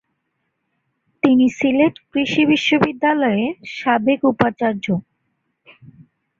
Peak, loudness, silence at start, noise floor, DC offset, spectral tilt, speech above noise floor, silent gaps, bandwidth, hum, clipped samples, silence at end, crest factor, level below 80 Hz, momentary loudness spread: -2 dBFS; -18 LUFS; 1.25 s; -73 dBFS; under 0.1%; -6 dB/octave; 55 dB; none; 7.6 kHz; none; under 0.1%; 1.4 s; 18 dB; -58 dBFS; 8 LU